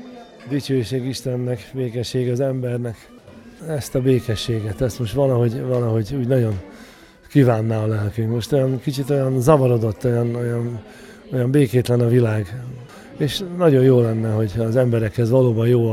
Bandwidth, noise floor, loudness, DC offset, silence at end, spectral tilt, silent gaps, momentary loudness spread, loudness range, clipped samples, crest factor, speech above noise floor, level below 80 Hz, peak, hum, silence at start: 14.5 kHz; -45 dBFS; -20 LUFS; under 0.1%; 0 s; -7.5 dB/octave; none; 12 LU; 5 LU; under 0.1%; 18 dB; 26 dB; -46 dBFS; -2 dBFS; none; 0 s